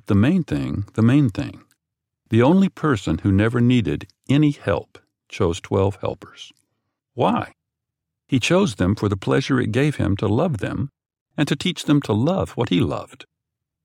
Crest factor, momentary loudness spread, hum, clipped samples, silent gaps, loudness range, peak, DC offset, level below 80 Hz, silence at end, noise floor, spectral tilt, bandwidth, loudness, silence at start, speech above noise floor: 18 dB; 13 LU; none; under 0.1%; 11.21-11.26 s; 5 LU; -2 dBFS; under 0.1%; -48 dBFS; 0.7 s; -82 dBFS; -7 dB/octave; 14.5 kHz; -20 LUFS; 0.1 s; 63 dB